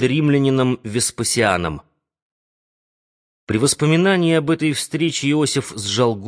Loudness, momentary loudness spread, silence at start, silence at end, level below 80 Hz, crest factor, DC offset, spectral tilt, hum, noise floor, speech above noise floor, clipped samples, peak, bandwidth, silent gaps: -18 LUFS; 7 LU; 0 s; 0 s; -50 dBFS; 16 dB; under 0.1%; -4.5 dB/octave; none; under -90 dBFS; over 72 dB; under 0.1%; -2 dBFS; 11 kHz; 2.22-3.47 s